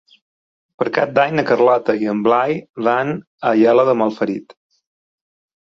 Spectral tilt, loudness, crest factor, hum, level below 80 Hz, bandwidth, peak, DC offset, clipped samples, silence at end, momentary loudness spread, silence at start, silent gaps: -7.5 dB/octave; -17 LUFS; 16 dB; none; -62 dBFS; 7.2 kHz; -2 dBFS; under 0.1%; under 0.1%; 1.15 s; 10 LU; 0.8 s; 2.69-2.74 s, 3.27-3.38 s